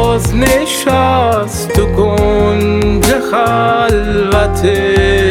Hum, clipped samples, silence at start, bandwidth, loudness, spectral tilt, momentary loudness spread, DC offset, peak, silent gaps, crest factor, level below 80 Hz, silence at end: none; 0.1%; 0 s; 19 kHz; -11 LUFS; -5 dB/octave; 2 LU; under 0.1%; 0 dBFS; none; 10 dB; -22 dBFS; 0 s